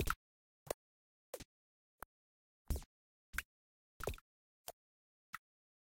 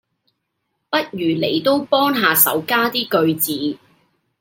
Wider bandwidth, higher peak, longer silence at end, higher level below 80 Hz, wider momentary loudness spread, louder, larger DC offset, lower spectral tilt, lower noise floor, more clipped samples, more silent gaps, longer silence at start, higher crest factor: about the same, 17 kHz vs 17 kHz; second, -22 dBFS vs 0 dBFS; about the same, 0.6 s vs 0.65 s; first, -56 dBFS vs -66 dBFS; first, 13 LU vs 9 LU; second, -49 LUFS vs -17 LUFS; neither; about the same, -3.5 dB/octave vs -3.5 dB/octave; first, under -90 dBFS vs -74 dBFS; neither; first, 0.16-0.66 s, 0.74-1.33 s, 1.45-1.98 s, 2.05-2.65 s, 2.86-3.33 s, 3.45-4.00 s, 4.21-4.65 s, 4.73-5.33 s vs none; second, 0 s vs 0.9 s; first, 28 dB vs 20 dB